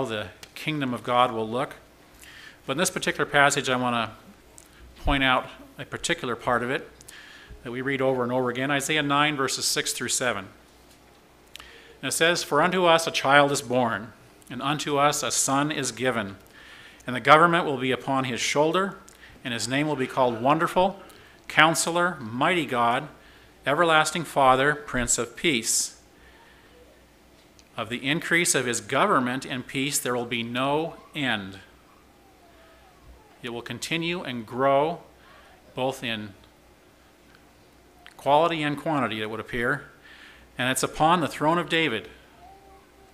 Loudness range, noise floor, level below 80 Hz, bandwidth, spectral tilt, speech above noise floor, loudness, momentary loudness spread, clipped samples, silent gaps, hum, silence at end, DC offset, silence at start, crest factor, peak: 6 LU; -56 dBFS; -50 dBFS; 16 kHz; -3 dB/octave; 31 dB; -24 LUFS; 17 LU; under 0.1%; none; none; 0.6 s; under 0.1%; 0 s; 26 dB; 0 dBFS